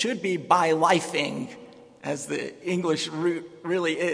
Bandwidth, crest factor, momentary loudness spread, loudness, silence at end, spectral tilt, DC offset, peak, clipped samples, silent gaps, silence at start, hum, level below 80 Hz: 11 kHz; 22 dB; 13 LU; -25 LUFS; 0 s; -4.5 dB/octave; under 0.1%; -4 dBFS; under 0.1%; none; 0 s; none; -72 dBFS